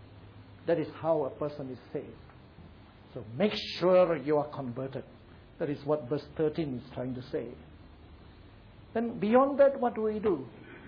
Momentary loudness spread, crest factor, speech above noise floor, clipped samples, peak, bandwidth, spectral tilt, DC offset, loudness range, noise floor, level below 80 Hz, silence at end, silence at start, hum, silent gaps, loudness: 17 LU; 18 dB; 23 dB; under 0.1%; -12 dBFS; 5.4 kHz; -5.5 dB/octave; under 0.1%; 6 LU; -53 dBFS; -60 dBFS; 0 s; 0 s; none; none; -30 LUFS